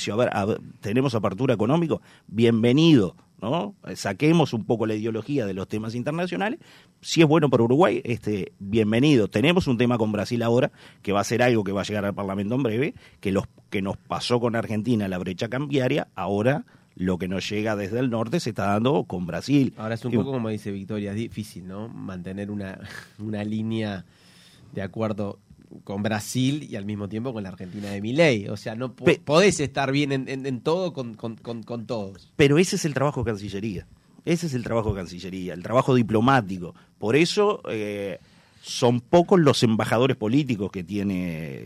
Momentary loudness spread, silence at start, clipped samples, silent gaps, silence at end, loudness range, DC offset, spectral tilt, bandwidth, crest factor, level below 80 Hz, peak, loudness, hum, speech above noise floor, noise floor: 14 LU; 0 s; under 0.1%; none; 0 s; 8 LU; under 0.1%; -6 dB/octave; 14.5 kHz; 18 dB; -56 dBFS; -6 dBFS; -24 LUFS; none; 28 dB; -52 dBFS